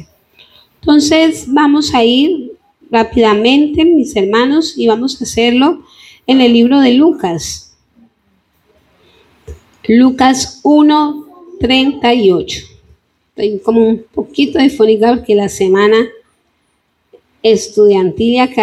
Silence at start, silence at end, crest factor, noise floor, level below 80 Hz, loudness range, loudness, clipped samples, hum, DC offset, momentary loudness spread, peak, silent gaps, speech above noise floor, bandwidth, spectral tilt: 0 s; 0 s; 12 dB; -61 dBFS; -42 dBFS; 3 LU; -11 LUFS; under 0.1%; none; under 0.1%; 11 LU; 0 dBFS; none; 51 dB; 13.5 kHz; -4.5 dB/octave